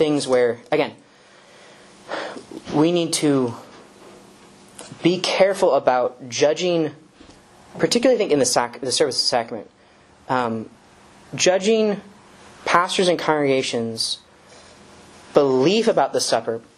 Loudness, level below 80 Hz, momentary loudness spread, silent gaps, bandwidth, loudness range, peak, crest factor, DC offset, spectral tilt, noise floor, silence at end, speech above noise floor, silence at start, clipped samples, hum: -20 LUFS; -64 dBFS; 14 LU; none; 12.5 kHz; 3 LU; 0 dBFS; 22 dB; under 0.1%; -3.5 dB/octave; -52 dBFS; 0.2 s; 32 dB; 0 s; under 0.1%; none